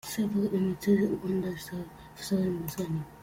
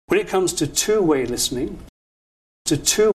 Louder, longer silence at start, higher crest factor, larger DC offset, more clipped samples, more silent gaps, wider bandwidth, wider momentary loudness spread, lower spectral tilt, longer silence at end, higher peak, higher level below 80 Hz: second, -30 LUFS vs -20 LUFS; about the same, 0.05 s vs 0.1 s; about the same, 18 dB vs 18 dB; neither; neither; second, none vs 1.89-2.65 s; first, 16.5 kHz vs 13.5 kHz; about the same, 13 LU vs 11 LU; first, -6.5 dB/octave vs -3 dB/octave; about the same, 0 s vs 0.05 s; second, -14 dBFS vs -2 dBFS; second, -58 dBFS vs -44 dBFS